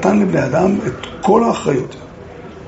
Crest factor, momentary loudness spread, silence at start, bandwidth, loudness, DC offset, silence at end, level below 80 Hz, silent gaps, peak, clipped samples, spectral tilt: 16 dB; 21 LU; 0 s; 8 kHz; -16 LUFS; under 0.1%; 0 s; -44 dBFS; none; 0 dBFS; under 0.1%; -6.5 dB/octave